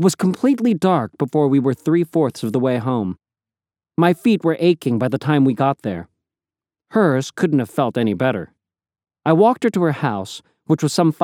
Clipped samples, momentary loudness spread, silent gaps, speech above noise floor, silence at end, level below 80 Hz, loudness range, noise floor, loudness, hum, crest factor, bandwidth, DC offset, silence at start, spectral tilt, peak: under 0.1%; 11 LU; none; over 73 dB; 0 s; -64 dBFS; 2 LU; under -90 dBFS; -18 LUFS; none; 18 dB; 16 kHz; under 0.1%; 0 s; -7 dB/octave; 0 dBFS